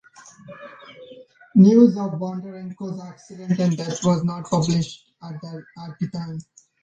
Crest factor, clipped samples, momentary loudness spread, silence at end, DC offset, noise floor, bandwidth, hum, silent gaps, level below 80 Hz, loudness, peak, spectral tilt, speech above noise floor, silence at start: 20 dB; under 0.1%; 25 LU; 0.4 s; under 0.1%; -46 dBFS; 8.2 kHz; none; none; -60 dBFS; -20 LUFS; -2 dBFS; -7 dB/octave; 26 dB; 0.45 s